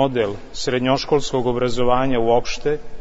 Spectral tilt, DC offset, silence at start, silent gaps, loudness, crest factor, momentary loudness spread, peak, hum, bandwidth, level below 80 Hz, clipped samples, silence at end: -5.5 dB/octave; under 0.1%; 0 s; none; -20 LUFS; 16 dB; 6 LU; -4 dBFS; none; 8 kHz; -36 dBFS; under 0.1%; 0 s